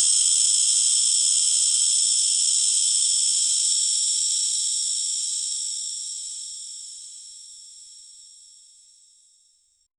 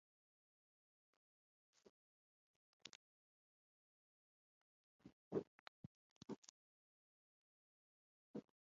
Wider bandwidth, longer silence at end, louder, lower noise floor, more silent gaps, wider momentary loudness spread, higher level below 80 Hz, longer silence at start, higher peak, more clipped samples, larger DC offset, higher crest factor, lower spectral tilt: first, 13 kHz vs 7.2 kHz; first, 1.75 s vs 0.25 s; first, -19 LUFS vs -55 LUFS; second, -63 dBFS vs under -90 dBFS; second, none vs 2.95-4.99 s, 5.12-5.31 s, 5.47-6.21 s, 6.38-6.42 s, 6.49-8.34 s; about the same, 18 LU vs 16 LU; first, -68 dBFS vs under -90 dBFS; second, 0 s vs 2.85 s; first, -6 dBFS vs -32 dBFS; neither; neither; second, 18 dB vs 30 dB; second, 6.5 dB/octave vs -5.5 dB/octave